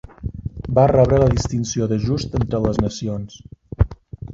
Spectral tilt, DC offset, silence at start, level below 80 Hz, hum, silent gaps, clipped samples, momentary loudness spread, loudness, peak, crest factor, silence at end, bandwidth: -7 dB/octave; under 0.1%; 0.2 s; -32 dBFS; none; none; under 0.1%; 17 LU; -19 LUFS; -2 dBFS; 18 dB; 0 s; 7.8 kHz